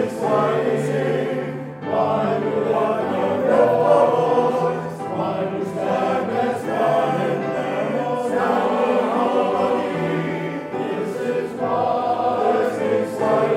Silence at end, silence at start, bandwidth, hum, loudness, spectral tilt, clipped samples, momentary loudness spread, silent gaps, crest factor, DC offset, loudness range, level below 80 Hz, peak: 0 s; 0 s; 14.5 kHz; none; -21 LUFS; -7 dB/octave; under 0.1%; 8 LU; none; 16 dB; under 0.1%; 3 LU; -62 dBFS; -4 dBFS